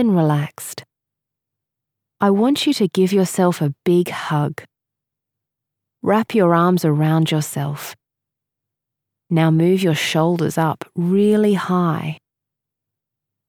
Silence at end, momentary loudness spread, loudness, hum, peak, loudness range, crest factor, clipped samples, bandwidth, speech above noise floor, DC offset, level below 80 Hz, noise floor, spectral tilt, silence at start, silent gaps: 1.35 s; 11 LU; -18 LUFS; none; -2 dBFS; 3 LU; 16 dB; under 0.1%; 18 kHz; 67 dB; under 0.1%; -70 dBFS; -84 dBFS; -6.5 dB/octave; 0 s; none